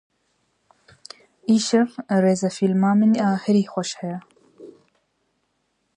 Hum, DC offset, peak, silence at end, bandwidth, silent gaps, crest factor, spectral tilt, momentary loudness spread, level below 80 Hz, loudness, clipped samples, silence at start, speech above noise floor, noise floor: none; under 0.1%; -6 dBFS; 1.25 s; 10.5 kHz; none; 16 dB; -6 dB/octave; 14 LU; -70 dBFS; -21 LUFS; under 0.1%; 1.5 s; 52 dB; -71 dBFS